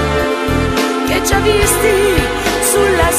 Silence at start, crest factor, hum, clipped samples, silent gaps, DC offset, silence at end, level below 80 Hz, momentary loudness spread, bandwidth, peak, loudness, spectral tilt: 0 s; 12 dB; none; under 0.1%; none; under 0.1%; 0 s; -24 dBFS; 4 LU; 15.5 kHz; 0 dBFS; -13 LUFS; -3.5 dB/octave